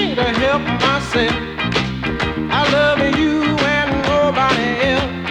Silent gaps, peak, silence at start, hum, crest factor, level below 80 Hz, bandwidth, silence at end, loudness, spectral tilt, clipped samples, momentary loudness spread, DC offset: none; -2 dBFS; 0 s; none; 16 dB; -34 dBFS; 11.5 kHz; 0 s; -16 LUFS; -5.5 dB/octave; under 0.1%; 5 LU; under 0.1%